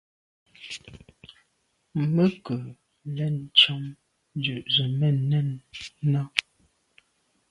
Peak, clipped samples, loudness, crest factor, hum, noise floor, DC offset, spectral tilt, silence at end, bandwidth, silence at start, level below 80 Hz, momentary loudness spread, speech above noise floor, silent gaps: 0 dBFS; under 0.1%; -24 LUFS; 28 dB; none; -72 dBFS; under 0.1%; -6 dB/octave; 1.1 s; 11.5 kHz; 0.6 s; -64 dBFS; 20 LU; 47 dB; none